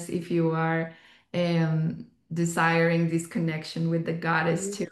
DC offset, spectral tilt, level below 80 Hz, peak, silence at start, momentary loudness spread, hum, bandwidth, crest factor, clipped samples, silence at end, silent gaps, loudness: under 0.1%; -6 dB/octave; -68 dBFS; -10 dBFS; 0 s; 8 LU; none; 12.5 kHz; 16 dB; under 0.1%; 0 s; none; -26 LUFS